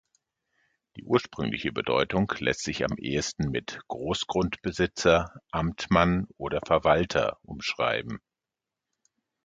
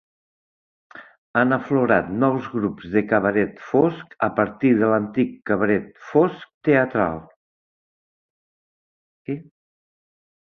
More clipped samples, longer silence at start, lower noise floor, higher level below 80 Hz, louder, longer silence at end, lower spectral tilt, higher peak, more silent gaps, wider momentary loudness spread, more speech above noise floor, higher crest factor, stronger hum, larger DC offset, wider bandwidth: neither; about the same, 0.95 s vs 0.95 s; about the same, -89 dBFS vs under -90 dBFS; first, -48 dBFS vs -56 dBFS; second, -27 LUFS vs -21 LUFS; first, 1.3 s vs 1.05 s; second, -5 dB/octave vs -9.5 dB/octave; about the same, -4 dBFS vs -2 dBFS; second, none vs 1.18-1.34 s, 6.54-6.61 s, 7.36-9.25 s; about the same, 10 LU vs 8 LU; second, 62 dB vs over 70 dB; about the same, 24 dB vs 20 dB; neither; neither; first, 9.2 kHz vs 6.4 kHz